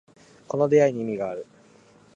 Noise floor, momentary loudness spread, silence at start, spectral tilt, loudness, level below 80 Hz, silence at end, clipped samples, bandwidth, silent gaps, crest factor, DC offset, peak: -55 dBFS; 13 LU; 0.55 s; -7 dB/octave; -23 LUFS; -68 dBFS; 0.7 s; under 0.1%; 7.8 kHz; none; 18 dB; under 0.1%; -8 dBFS